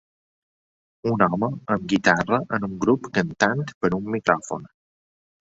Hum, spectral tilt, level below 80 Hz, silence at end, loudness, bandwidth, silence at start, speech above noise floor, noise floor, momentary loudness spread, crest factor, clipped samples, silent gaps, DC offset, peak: none; -6 dB/octave; -56 dBFS; 0.75 s; -23 LUFS; 8 kHz; 1.05 s; over 68 dB; under -90 dBFS; 8 LU; 22 dB; under 0.1%; 3.74-3.81 s; under 0.1%; -2 dBFS